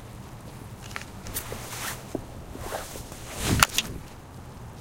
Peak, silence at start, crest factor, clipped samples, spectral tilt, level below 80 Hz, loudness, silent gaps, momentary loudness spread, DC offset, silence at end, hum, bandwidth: 0 dBFS; 0 s; 32 dB; under 0.1%; -3 dB/octave; -42 dBFS; -29 LUFS; none; 21 LU; under 0.1%; 0 s; none; 17 kHz